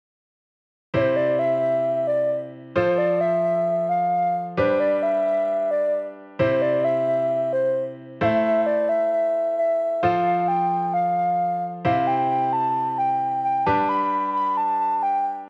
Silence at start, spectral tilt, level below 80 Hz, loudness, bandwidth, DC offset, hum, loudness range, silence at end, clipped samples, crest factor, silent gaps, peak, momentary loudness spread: 0.95 s; -8 dB/octave; -60 dBFS; -22 LUFS; 6 kHz; under 0.1%; none; 1 LU; 0 s; under 0.1%; 14 dB; none; -8 dBFS; 3 LU